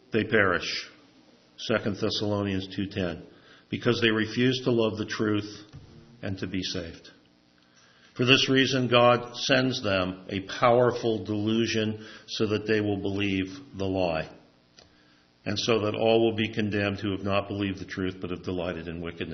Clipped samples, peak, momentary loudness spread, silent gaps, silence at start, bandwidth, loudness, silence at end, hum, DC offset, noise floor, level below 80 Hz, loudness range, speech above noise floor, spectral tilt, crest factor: under 0.1%; -2 dBFS; 14 LU; none; 0.1 s; 6.4 kHz; -26 LUFS; 0 s; none; under 0.1%; -61 dBFS; -62 dBFS; 6 LU; 35 dB; -5 dB/octave; 26 dB